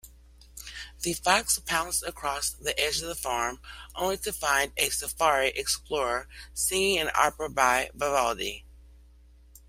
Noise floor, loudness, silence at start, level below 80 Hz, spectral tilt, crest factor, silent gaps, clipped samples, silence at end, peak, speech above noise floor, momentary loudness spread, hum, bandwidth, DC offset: -54 dBFS; -27 LUFS; 0.05 s; -50 dBFS; -1 dB/octave; 24 dB; none; under 0.1%; 0.75 s; -6 dBFS; 26 dB; 11 LU; none; 16 kHz; under 0.1%